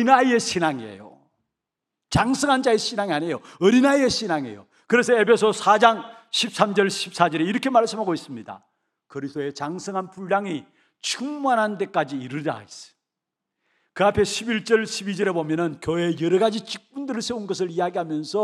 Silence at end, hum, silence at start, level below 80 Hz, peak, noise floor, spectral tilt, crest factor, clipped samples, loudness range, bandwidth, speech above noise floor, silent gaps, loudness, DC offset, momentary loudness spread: 0 s; none; 0 s; -56 dBFS; 0 dBFS; -85 dBFS; -4.5 dB/octave; 22 dB; under 0.1%; 7 LU; 13.5 kHz; 63 dB; none; -22 LUFS; under 0.1%; 14 LU